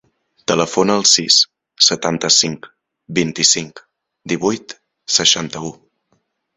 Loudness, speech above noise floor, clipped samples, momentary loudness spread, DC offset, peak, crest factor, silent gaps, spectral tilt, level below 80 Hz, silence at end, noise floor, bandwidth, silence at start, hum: -14 LUFS; 49 dB; under 0.1%; 16 LU; under 0.1%; 0 dBFS; 18 dB; none; -2 dB/octave; -56 dBFS; 0.85 s; -66 dBFS; 16 kHz; 0.5 s; none